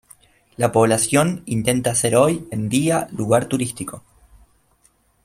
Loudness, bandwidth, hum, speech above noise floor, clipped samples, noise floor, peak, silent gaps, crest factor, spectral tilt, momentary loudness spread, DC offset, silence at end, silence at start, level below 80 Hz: -19 LUFS; 16 kHz; none; 41 dB; under 0.1%; -60 dBFS; -2 dBFS; none; 18 dB; -5 dB/octave; 8 LU; under 0.1%; 1.25 s; 0.6 s; -52 dBFS